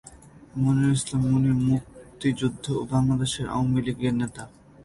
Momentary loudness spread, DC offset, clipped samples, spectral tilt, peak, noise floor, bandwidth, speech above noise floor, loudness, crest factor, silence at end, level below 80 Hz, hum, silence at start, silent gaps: 8 LU; under 0.1%; under 0.1%; -6.5 dB/octave; -12 dBFS; -48 dBFS; 11.5 kHz; 24 dB; -25 LUFS; 12 dB; 0.35 s; -48 dBFS; none; 0.05 s; none